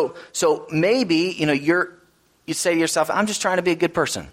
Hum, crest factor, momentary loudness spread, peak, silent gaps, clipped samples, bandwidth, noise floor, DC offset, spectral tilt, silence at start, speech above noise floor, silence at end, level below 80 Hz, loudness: none; 16 dB; 5 LU; -4 dBFS; none; under 0.1%; 16 kHz; -58 dBFS; under 0.1%; -4 dB/octave; 0 s; 37 dB; 0 s; -58 dBFS; -21 LUFS